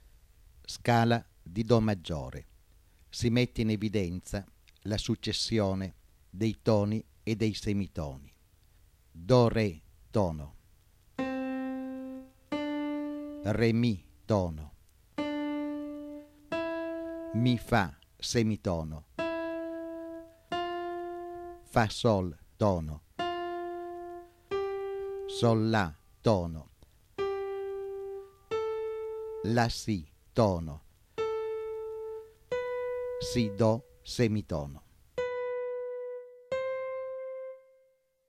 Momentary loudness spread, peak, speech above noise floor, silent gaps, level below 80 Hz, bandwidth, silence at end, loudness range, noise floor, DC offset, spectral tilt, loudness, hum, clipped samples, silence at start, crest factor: 16 LU; -12 dBFS; 40 dB; none; -52 dBFS; 15 kHz; 0.7 s; 4 LU; -69 dBFS; under 0.1%; -6 dB/octave; -32 LUFS; none; under 0.1%; 0.55 s; 20 dB